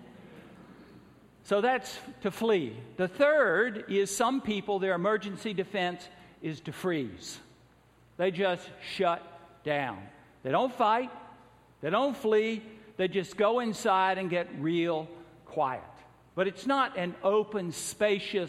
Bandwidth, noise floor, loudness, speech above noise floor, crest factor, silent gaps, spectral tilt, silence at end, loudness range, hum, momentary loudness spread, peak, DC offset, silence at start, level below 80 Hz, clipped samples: 15 kHz; -61 dBFS; -30 LUFS; 32 dB; 18 dB; none; -4.5 dB/octave; 0 s; 5 LU; none; 13 LU; -12 dBFS; under 0.1%; 0 s; -68 dBFS; under 0.1%